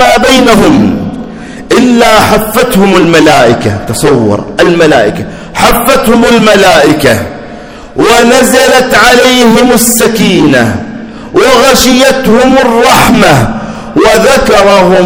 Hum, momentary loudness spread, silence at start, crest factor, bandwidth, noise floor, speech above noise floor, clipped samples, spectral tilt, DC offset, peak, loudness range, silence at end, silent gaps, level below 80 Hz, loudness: none; 12 LU; 0 s; 4 dB; over 20 kHz; -25 dBFS; 20 dB; 20%; -4 dB/octave; under 0.1%; 0 dBFS; 2 LU; 0 s; none; -26 dBFS; -5 LUFS